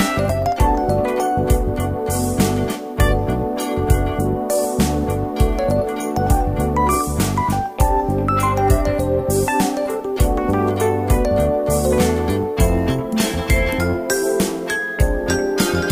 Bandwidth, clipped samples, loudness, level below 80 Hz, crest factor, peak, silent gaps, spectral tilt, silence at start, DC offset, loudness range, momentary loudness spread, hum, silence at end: 16 kHz; under 0.1%; -19 LUFS; -24 dBFS; 16 dB; 0 dBFS; none; -5.5 dB/octave; 0 s; under 0.1%; 1 LU; 4 LU; none; 0 s